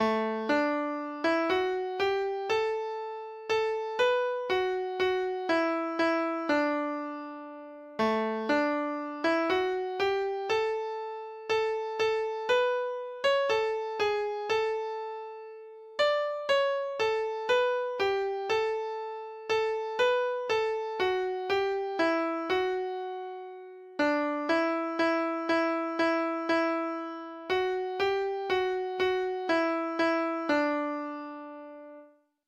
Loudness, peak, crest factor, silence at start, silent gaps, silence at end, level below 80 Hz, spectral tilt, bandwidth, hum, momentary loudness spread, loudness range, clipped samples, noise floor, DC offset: -29 LUFS; -14 dBFS; 14 dB; 0 s; none; 0.4 s; -68 dBFS; -4 dB/octave; 11.5 kHz; none; 12 LU; 2 LU; under 0.1%; -56 dBFS; under 0.1%